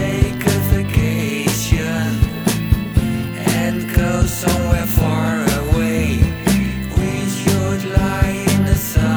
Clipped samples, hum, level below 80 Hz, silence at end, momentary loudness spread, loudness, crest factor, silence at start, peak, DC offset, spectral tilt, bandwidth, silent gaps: under 0.1%; none; -24 dBFS; 0 s; 3 LU; -17 LUFS; 14 dB; 0 s; -2 dBFS; 0.1%; -5.5 dB/octave; over 20 kHz; none